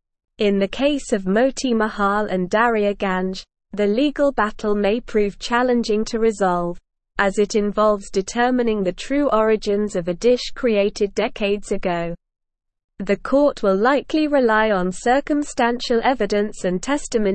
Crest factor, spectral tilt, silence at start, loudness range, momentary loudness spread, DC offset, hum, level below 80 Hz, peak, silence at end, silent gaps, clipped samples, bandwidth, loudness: 18 dB; -5 dB/octave; 0.4 s; 3 LU; 6 LU; 0.4%; none; -42 dBFS; -2 dBFS; 0 s; 12.84-12.88 s; under 0.1%; 8.8 kHz; -20 LUFS